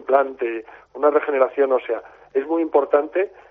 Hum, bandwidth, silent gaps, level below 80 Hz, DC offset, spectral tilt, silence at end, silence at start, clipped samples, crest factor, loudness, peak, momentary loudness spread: none; 3.8 kHz; none; -68 dBFS; under 0.1%; -2 dB/octave; 0.2 s; 0 s; under 0.1%; 18 dB; -21 LUFS; -4 dBFS; 10 LU